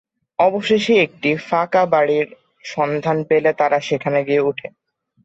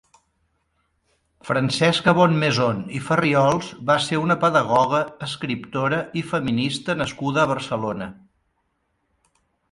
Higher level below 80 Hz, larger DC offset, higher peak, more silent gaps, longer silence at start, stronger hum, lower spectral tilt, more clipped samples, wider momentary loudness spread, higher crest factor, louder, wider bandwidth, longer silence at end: second, -62 dBFS vs -56 dBFS; neither; about the same, -4 dBFS vs -2 dBFS; neither; second, 0.4 s vs 1.45 s; neither; about the same, -5.5 dB/octave vs -5.5 dB/octave; neither; first, 13 LU vs 10 LU; second, 14 dB vs 20 dB; first, -18 LUFS vs -21 LUFS; second, 8 kHz vs 11.5 kHz; second, 0.55 s vs 1.6 s